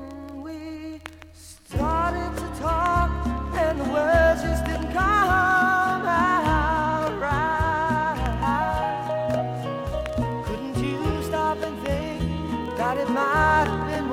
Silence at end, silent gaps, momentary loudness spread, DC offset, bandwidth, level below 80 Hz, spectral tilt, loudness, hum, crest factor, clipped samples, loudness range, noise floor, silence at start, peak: 0 s; none; 11 LU; under 0.1%; 16 kHz; -34 dBFS; -6 dB/octave; -23 LUFS; none; 16 dB; under 0.1%; 6 LU; -46 dBFS; 0 s; -8 dBFS